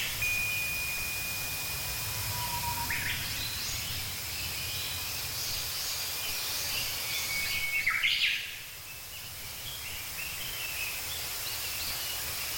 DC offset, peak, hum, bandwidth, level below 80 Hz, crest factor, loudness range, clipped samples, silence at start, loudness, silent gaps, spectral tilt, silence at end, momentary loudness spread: under 0.1%; -16 dBFS; none; 17 kHz; -52 dBFS; 18 dB; 4 LU; under 0.1%; 0 s; -31 LUFS; none; -0.5 dB/octave; 0 s; 8 LU